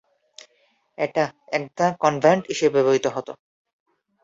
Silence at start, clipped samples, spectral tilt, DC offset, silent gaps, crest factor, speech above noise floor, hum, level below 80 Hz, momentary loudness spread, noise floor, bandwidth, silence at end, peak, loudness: 1 s; under 0.1%; -5 dB/octave; under 0.1%; none; 22 dB; 44 dB; none; -66 dBFS; 10 LU; -65 dBFS; 7.8 kHz; 0.9 s; -2 dBFS; -22 LUFS